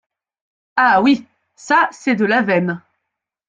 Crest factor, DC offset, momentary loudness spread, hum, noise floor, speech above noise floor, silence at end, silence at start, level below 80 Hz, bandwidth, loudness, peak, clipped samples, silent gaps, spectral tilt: 16 dB; under 0.1%; 10 LU; none; -79 dBFS; 64 dB; 0.7 s; 0.75 s; -62 dBFS; 9 kHz; -16 LUFS; -2 dBFS; under 0.1%; none; -5.5 dB/octave